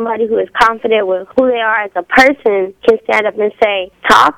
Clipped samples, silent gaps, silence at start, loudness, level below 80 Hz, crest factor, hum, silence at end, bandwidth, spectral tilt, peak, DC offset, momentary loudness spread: 0.2%; none; 0 s; -12 LUFS; -44 dBFS; 12 dB; none; 0.05 s; 17.5 kHz; -3.5 dB/octave; 0 dBFS; under 0.1%; 6 LU